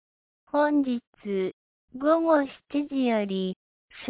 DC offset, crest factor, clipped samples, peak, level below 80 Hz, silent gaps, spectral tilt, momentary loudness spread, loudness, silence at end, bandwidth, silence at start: under 0.1%; 16 dB; under 0.1%; -12 dBFS; -70 dBFS; 1.07-1.13 s, 1.53-1.88 s, 3.56-3.88 s; -10 dB/octave; 11 LU; -26 LUFS; 0 s; 4 kHz; 0.55 s